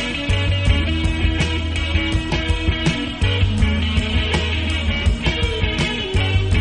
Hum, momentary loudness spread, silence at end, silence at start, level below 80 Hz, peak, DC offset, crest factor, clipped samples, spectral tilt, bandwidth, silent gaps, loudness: none; 2 LU; 0 s; 0 s; -22 dBFS; -4 dBFS; under 0.1%; 14 dB; under 0.1%; -5.5 dB/octave; 10 kHz; none; -19 LUFS